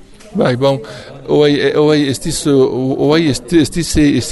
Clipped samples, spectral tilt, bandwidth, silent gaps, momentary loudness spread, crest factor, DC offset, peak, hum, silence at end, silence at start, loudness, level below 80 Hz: under 0.1%; -5.5 dB/octave; 12 kHz; none; 6 LU; 12 dB; under 0.1%; 0 dBFS; none; 0 s; 0.25 s; -13 LUFS; -32 dBFS